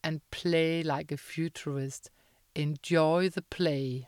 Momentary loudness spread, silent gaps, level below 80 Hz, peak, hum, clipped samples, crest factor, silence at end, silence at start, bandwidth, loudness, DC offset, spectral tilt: 11 LU; none; -62 dBFS; -14 dBFS; none; under 0.1%; 18 dB; 0 s; 0.05 s; 16 kHz; -31 LUFS; under 0.1%; -6 dB/octave